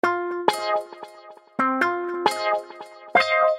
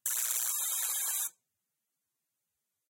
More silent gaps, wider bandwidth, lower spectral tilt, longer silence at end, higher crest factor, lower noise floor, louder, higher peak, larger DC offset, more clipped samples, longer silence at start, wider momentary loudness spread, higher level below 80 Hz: neither; about the same, 16 kHz vs 17.5 kHz; first, -3 dB/octave vs 6 dB/octave; second, 0 s vs 1.6 s; about the same, 22 dB vs 20 dB; second, -46 dBFS vs -86 dBFS; first, -23 LUFS vs -31 LUFS; first, -2 dBFS vs -16 dBFS; neither; neither; about the same, 0.05 s vs 0.05 s; first, 20 LU vs 4 LU; first, -70 dBFS vs under -90 dBFS